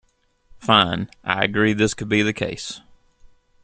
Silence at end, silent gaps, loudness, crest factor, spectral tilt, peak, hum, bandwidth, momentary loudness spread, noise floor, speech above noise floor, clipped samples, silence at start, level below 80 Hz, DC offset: 0.85 s; none; -20 LUFS; 22 dB; -4.5 dB/octave; -2 dBFS; none; 9.6 kHz; 15 LU; -55 dBFS; 35 dB; under 0.1%; 0.55 s; -52 dBFS; under 0.1%